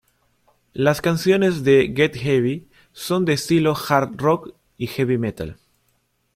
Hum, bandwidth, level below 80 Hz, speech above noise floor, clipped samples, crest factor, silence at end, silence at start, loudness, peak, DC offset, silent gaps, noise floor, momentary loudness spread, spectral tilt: none; 16 kHz; -52 dBFS; 48 dB; under 0.1%; 18 dB; 0.85 s; 0.75 s; -20 LUFS; -2 dBFS; under 0.1%; none; -67 dBFS; 15 LU; -6 dB/octave